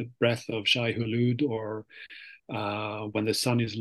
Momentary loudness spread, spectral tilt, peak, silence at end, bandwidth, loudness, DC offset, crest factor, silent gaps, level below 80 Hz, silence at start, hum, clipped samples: 17 LU; -5 dB/octave; -10 dBFS; 0 s; 12.5 kHz; -28 LUFS; under 0.1%; 20 dB; none; -68 dBFS; 0 s; none; under 0.1%